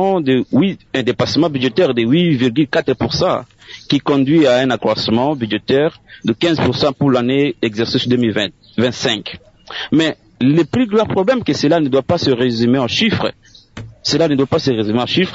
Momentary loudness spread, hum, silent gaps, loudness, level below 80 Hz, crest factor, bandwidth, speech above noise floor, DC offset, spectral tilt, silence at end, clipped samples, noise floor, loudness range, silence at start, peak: 7 LU; none; none; -15 LUFS; -50 dBFS; 12 dB; 8 kHz; 20 dB; under 0.1%; -6 dB/octave; 0 s; under 0.1%; -34 dBFS; 2 LU; 0 s; -2 dBFS